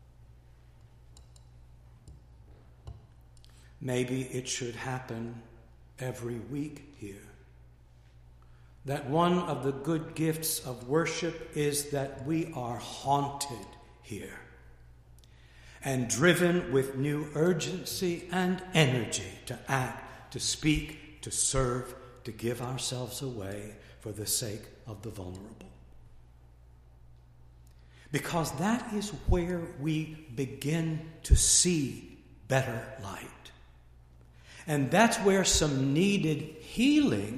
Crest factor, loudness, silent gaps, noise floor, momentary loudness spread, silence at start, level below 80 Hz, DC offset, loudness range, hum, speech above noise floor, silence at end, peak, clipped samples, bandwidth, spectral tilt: 24 dB; -30 LUFS; none; -56 dBFS; 20 LU; 0.2 s; -44 dBFS; under 0.1%; 11 LU; none; 26 dB; 0 s; -8 dBFS; under 0.1%; 15.5 kHz; -4 dB/octave